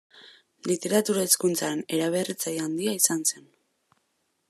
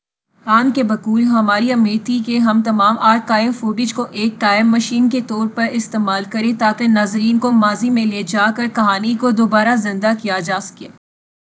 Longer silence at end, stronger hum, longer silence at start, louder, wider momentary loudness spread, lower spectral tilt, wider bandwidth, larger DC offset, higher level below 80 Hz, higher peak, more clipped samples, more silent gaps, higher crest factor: first, 1.1 s vs 0.65 s; neither; second, 0.15 s vs 0.45 s; second, -25 LUFS vs -15 LUFS; about the same, 7 LU vs 6 LU; second, -3 dB/octave vs -5 dB/octave; first, 14 kHz vs 8 kHz; neither; second, -78 dBFS vs -66 dBFS; second, -6 dBFS vs 0 dBFS; neither; neither; first, 22 dB vs 16 dB